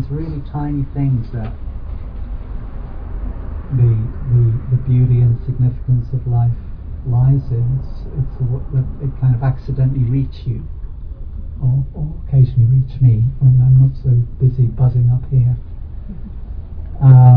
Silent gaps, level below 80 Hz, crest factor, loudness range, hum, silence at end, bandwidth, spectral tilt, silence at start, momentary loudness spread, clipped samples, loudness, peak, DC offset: none; -26 dBFS; 14 dB; 7 LU; none; 0 s; 2.5 kHz; -13 dB/octave; 0 s; 19 LU; under 0.1%; -16 LUFS; 0 dBFS; under 0.1%